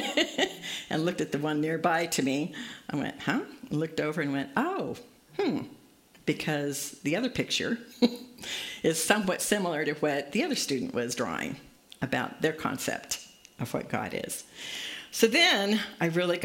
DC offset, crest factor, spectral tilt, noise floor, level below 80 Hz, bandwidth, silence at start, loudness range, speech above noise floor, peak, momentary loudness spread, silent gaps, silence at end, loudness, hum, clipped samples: under 0.1%; 24 dB; -3.5 dB/octave; -58 dBFS; -66 dBFS; 16.5 kHz; 0 s; 4 LU; 29 dB; -6 dBFS; 11 LU; none; 0 s; -29 LUFS; none; under 0.1%